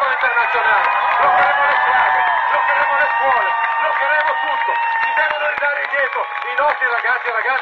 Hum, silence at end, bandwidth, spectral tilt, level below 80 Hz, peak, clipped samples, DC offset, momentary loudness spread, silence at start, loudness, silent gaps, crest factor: none; 0 s; 6.6 kHz; -3 dB/octave; -58 dBFS; -4 dBFS; under 0.1%; under 0.1%; 4 LU; 0 s; -15 LUFS; none; 12 dB